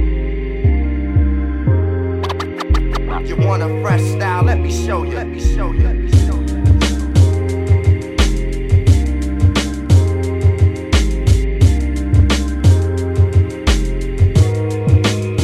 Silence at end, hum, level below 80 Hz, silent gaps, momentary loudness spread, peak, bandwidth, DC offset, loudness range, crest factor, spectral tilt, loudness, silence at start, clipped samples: 0 s; none; -18 dBFS; none; 6 LU; -2 dBFS; 12 kHz; under 0.1%; 3 LU; 12 dB; -6.5 dB/octave; -16 LUFS; 0 s; under 0.1%